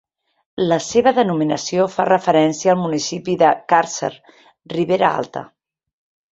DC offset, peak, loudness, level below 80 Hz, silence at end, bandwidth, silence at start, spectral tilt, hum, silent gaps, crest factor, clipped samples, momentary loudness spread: under 0.1%; -2 dBFS; -18 LUFS; -60 dBFS; 0.85 s; 8.2 kHz; 0.55 s; -5 dB/octave; none; none; 16 dB; under 0.1%; 11 LU